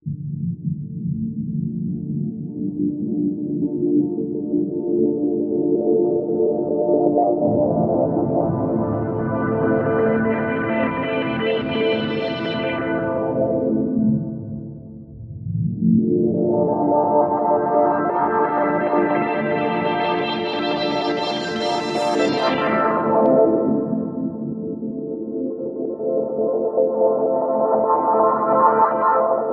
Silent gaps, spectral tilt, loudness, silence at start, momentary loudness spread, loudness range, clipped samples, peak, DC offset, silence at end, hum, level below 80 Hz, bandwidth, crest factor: none; -7.5 dB/octave; -20 LUFS; 0.05 s; 9 LU; 5 LU; under 0.1%; -2 dBFS; under 0.1%; 0 s; none; -52 dBFS; 9 kHz; 16 dB